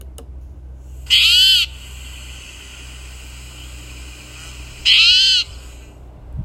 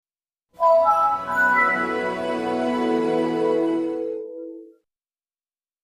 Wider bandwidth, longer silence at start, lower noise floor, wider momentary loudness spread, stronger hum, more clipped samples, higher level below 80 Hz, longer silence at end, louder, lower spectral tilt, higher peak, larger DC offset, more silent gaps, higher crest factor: first, 16 kHz vs 14.5 kHz; second, 0 s vs 0.6 s; second, -38 dBFS vs under -90 dBFS; first, 27 LU vs 13 LU; neither; neither; first, -36 dBFS vs -62 dBFS; second, 0 s vs 1.2 s; first, -11 LUFS vs -21 LUFS; second, 0.5 dB/octave vs -5.5 dB/octave; first, 0 dBFS vs -8 dBFS; neither; neither; about the same, 18 dB vs 16 dB